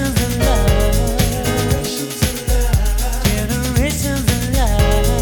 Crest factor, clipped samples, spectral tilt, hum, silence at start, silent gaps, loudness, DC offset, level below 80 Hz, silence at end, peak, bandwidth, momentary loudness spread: 16 dB; under 0.1%; -4.5 dB/octave; none; 0 s; none; -17 LUFS; under 0.1%; -18 dBFS; 0 s; 0 dBFS; over 20 kHz; 4 LU